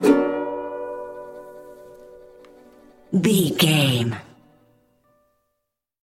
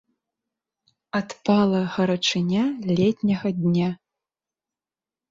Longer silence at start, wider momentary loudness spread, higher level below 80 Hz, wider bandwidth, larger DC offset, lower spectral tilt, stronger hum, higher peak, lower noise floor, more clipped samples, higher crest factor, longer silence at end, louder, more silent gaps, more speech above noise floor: second, 0 s vs 1.15 s; first, 24 LU vs 9 LU; about the same, -62 dBFS vs -62 dBFS; first, 16.5 kHz vs 7.8 kHz; neither; about the same, -5 dB/octave vs -6 dB/octave; neither; first, -2 dBFS vs -8 dBFS; second, -79 dBFS vs under -90 dBFS; neither; first, 22 dB vs 16 dB; first, 1.8 s vs 1.35 s; about the same, -21 LUFS vs -23 LUFS; neither; second, 60 dB vs over 68 dB